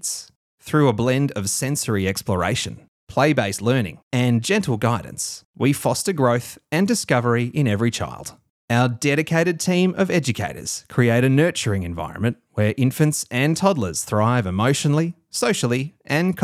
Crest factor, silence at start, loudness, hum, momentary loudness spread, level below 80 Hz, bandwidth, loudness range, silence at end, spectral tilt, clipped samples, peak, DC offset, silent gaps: 18 dB; 0.05 s; -21 LUFS; none; 7 LU; -52 dBFS; 15.5 kHz; 1 LU; 0 s; -5 dB/octave; under 0.1%; -4 dBFS; under 0.1%; 0.36-0.58 s, 2.88-3.07 s, 4.03-4.11 s, 5.45-5.54 s, 8.50-8.68 s